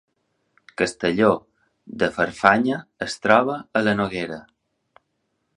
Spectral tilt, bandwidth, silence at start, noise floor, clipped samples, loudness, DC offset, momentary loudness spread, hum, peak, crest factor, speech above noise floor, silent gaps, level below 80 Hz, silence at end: -5 dB/octave; 11 kHz; 0.8 s; -74 dBFS; under 0.1%; -21 LUFS; under 0.1%; 13 LU; none; 0 dBFS; 22 dB; 53 dB; none; -56 dBFS; 1.15 s